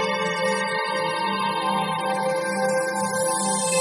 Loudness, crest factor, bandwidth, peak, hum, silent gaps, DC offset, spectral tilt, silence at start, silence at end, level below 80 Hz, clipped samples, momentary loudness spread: -23 LUFS; 14 dB; 11.5 kHz; -10 dBFS; none; none; under 0.1%; -3 dB/octave; 0 s; 0 s; -68 dBFS; under 0.1%; 2 LU